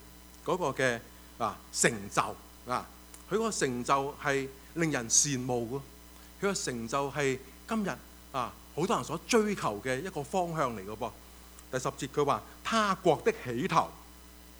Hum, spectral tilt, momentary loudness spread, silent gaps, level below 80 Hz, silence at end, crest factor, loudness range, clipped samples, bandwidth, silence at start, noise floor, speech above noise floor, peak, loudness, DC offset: none; -3.5 dB/octave; 16 LU; none; -56 dBFS; 0 s; 24 dB; 4 LU; under 0.1%; over 20 kHz; 0 s; -52 dBFS; 21 dB; -8 dBFS; -31 LUFS; under 0.1%